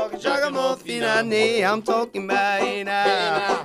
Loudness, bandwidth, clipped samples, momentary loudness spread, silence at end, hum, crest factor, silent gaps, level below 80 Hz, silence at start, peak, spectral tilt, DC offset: -21 LUFS; 15 kHz; under 0.1%; 5 LU; 0 s; none; 14 dB; none; -62 dBFS; 0 s; -8 dBFS; -3.5 dB/octave; under 0.1%